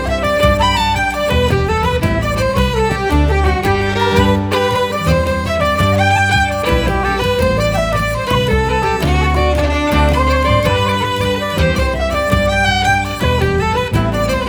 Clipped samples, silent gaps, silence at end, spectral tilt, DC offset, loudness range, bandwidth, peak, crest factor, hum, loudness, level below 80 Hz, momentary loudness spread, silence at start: under 0.1%; none; 0 s; -5.5 dB/octave; under 0.1%; 1 LU; over 20 kHz; 0 dBFS; 14 dB; none; -14 LUFS; -22 dBFS; 3 LU; 0 s